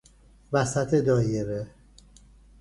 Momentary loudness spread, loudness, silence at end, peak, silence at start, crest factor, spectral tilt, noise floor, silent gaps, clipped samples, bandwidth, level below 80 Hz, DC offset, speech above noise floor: 12 LU; -26 LUFS; 0.9 s; -8 dBFS; 0.5 s; 18 dB; -6.5 dB/octave; -53 dBFS; none; under 0.1%; 11.5 kHz; -52 dBFS; under 0.1%; 29 dB